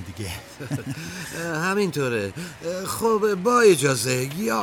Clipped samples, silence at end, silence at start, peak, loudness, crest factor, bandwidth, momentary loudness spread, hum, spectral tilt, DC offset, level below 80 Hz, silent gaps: under 0.1%; 0 s; 0 s; -6 dBFS; -23 LUFS; 18 dB; 19 kHz; 16 LU; none; -4.5 dB/octave; under 0.1%; -54 dBFS; none